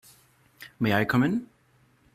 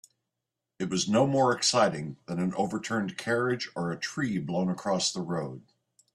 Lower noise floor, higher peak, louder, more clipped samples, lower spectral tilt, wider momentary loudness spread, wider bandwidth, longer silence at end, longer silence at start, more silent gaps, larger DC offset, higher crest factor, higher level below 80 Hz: second, -63 dBFS vs -86 dBFS; about the same, -8 dBFS vs -10 dBFS; about the same, -26 LUFS vs -28 LUFS; neither; first, -7 dB/octave vs -4.5 dB/octave; first, 25 LU vs 11 LU; first, 15.5 kHz vs 12.5 kHz; first, 0.7 s vs 0.55 s; second, 0.6 s vs 0.8 s; neither; neither; about the same, 20 dB vs 20 dB; about the same, -62 dBFS vs -66 dBFS